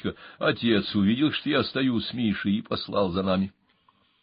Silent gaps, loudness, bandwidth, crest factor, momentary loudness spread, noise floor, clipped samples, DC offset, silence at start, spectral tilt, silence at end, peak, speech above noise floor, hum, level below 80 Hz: none; -26 LUFS; 5.4 kHz; 16 dB; 5 LU; -65 dBFS; under 0.1%; under 0.1%; 0.05 s; -10.5 dB/octave; 0.75 s; -10 dBFS; 40 dB; none; -52 dBFS